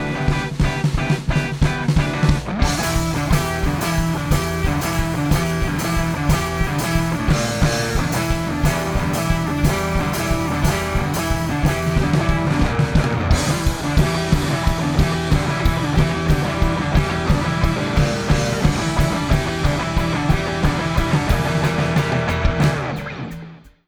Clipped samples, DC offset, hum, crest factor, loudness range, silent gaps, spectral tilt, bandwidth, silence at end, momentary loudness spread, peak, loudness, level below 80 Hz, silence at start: under 0.1%; under 0.1%; none; 16 dB; 1 LU; none; -5.5 dB/octave; over 20 kHz; 0.2 s; 3 LU; -2 dBFS; -20 LUFS; -24 dBFS; 0 s